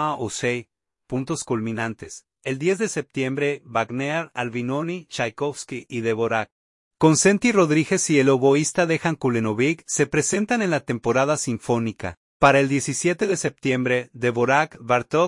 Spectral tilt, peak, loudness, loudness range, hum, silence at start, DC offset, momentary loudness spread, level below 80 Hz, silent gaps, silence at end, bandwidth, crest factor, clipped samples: -4.5 dB/octave; -2 dBFS; -22 LUFS; 7 LU; none; 0 s; under 0.1%; 11 LU; -58 dBFS; 6.52-6.91 s, 12.17-12.40 s; 0 s; 11.5 kHz; 20 dB; under 0.1%